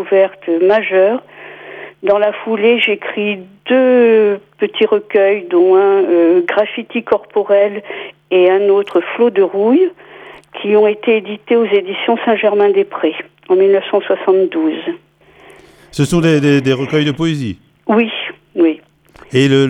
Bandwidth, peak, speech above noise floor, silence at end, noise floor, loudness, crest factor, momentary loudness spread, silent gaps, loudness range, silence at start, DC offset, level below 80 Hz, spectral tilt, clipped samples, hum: 10.5 kHz; 0 dBFS; 31 dB; 0 s; -43 dBFS; -13 LUFS; 12 dB; 12 LU; none; 3 LU; 0 s; under 0.1%; -52 dBFS; -6.5 dB/octave; under 0.1%; none